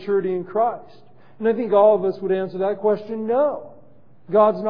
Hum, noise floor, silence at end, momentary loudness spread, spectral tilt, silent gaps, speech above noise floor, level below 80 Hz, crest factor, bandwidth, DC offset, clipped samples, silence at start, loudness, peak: none; -53 dBFS; 0 s; 9 LU; -10 dB/octave; none; 33 dB; -72 dBFS; 16 dB; 5.2 kHz; 0.6%; under 0.1%; 0 s; -20 LUFS; -4 dBFS